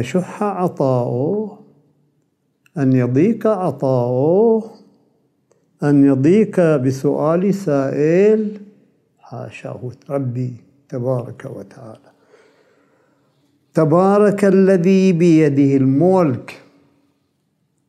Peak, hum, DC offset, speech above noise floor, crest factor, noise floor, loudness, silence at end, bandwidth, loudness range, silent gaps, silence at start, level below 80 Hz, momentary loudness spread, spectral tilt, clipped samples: -2 dBFS; none; under 0.1%; 51 dB; 16 dB; -66 dBFS; -16 LUFS; 1.3 s; 12.5 kHz; 13 LU; none; 0 s; -66 dBFS; 18 LU; -8.5 dB/octave; under 0.1%